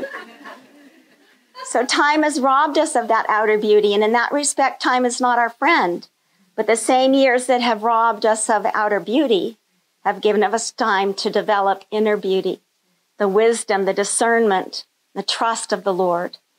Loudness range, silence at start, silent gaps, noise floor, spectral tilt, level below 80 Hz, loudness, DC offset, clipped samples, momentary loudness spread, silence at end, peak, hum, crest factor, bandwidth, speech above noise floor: 3 LU; 0 s; none; -66 dBFS; -3 dB/octave; -84 dBFS; -18 LUFS; under 0.1%; under 0.1%; 9 LU; 0.3 s; -6 dBFS; none; 12 dB; 15.5 kHz; 48 dB